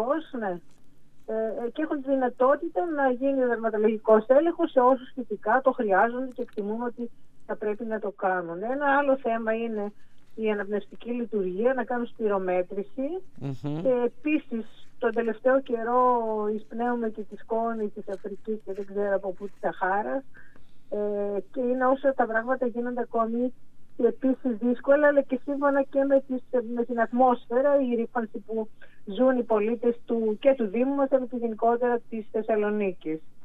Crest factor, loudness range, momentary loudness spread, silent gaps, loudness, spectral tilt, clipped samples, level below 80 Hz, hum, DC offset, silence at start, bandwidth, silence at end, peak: 20 dB; 6 LU; 11 LU; none; -27 LUFS; -8.5 dB/octave; under 0.1%; -64 dBFS; none; under 0.1%; 0 s; 4 kHz; 0 s; -6 dBFS